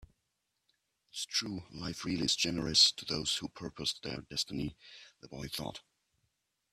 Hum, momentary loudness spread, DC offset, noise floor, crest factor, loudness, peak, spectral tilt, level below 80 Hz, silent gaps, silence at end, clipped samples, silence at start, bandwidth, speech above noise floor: none; 21 LU; under 0.1%; -83 dBFS; 24 dB; -32 LUFS; -12 dBFS; -2.5 dB/octave; -62 dBFS; none; 0.95 s; under 0.1%; 0 s; 15.5 kHz; 48 dB